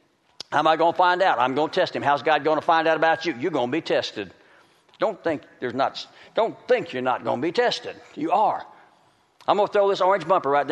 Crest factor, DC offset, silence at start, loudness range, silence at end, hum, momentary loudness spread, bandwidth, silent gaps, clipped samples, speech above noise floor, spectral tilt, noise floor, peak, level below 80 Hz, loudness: 18 dB; under 0.1%; 0.5 s; 6 LU; 0 s; none; 11 LU; 9.8 kHz; none; under 0.1%; 38 dB; -5 dB/octave; -60 dBFS; -6 dBFS; -72 dBFS; -23 LUFS